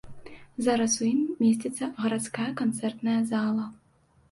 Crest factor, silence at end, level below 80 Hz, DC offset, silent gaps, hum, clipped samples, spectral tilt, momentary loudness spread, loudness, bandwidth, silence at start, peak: 16 dB; 0.6 s; -64 dBFS; under 0.1%; none; none; under 0.1%; -4.5 dB/octave; 7 LU; -27 LUFS; 11.5 kHz; 0.05 s; -12 dBFS